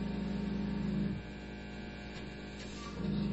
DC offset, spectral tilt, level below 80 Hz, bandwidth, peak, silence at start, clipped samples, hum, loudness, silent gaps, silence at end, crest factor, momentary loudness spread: under 0.1%; -6.5 dB/octave; -50 dBFS; 8 kHz; -24 dBFS; 0 s; under 0.1%; none; -40 LUFS; none; 0 s; 14 dB; 9 LU